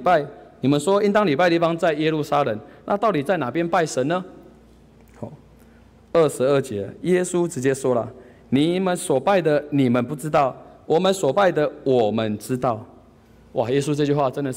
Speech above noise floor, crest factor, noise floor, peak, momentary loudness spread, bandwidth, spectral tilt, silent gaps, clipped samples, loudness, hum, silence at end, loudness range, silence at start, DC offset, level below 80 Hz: 30 dB; 14 dB; -50 dBFS; -8 dBFS; 9 LU; 16 kHz; -6 dB/octave; none; under 0.1%; -21 LUFS; none; 0 s; 4 LU; 0 s; under 0.1%; -56 dBFS